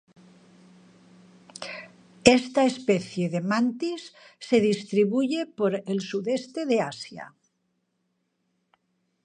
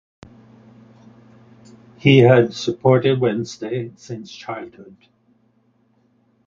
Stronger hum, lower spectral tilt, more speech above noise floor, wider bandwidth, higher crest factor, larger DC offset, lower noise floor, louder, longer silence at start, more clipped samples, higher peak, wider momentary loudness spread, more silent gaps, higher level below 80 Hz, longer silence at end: neither; second, -5 dB/octave vs -7 dB/octave; first, 50 dB vs 43 dB; first, 10.5 kHz vs 7.4 kHz; first, 26 dB vs 20 dB; neither; first, -75 dBFS vs -61 dBFS; second, -25 LUFS vs -17 LUFS; second, 1.6 s vs 2.05 s; neither; about the same, 0 dBFS vs 0 dBFS; about the same, 19 LU vs 20 LU; neither; about the same, -62 dBFS vs -58 dBFS; first, 1.95 s vs 1.65 s